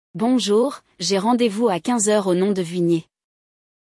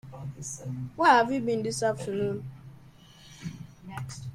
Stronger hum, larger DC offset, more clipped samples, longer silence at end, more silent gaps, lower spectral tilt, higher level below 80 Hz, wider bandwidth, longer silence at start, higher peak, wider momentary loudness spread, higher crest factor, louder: neither; neither; neither; first, 0.9 s vs 0 s; neither; about the same, -4.5 dB/octave vs -5 dB/octave; second, -68 dBFS vs -60 dBFS; second, 12 kHz vs 15.5 kHz; about the same, 0.15 s vs 0.05 s; about the same, -6 dBFS vs -8 dBFS; second, 5 LU vs 21 LU; second, 14 dB vs 22 dB; first, -20 LUFS vs -27 LUFS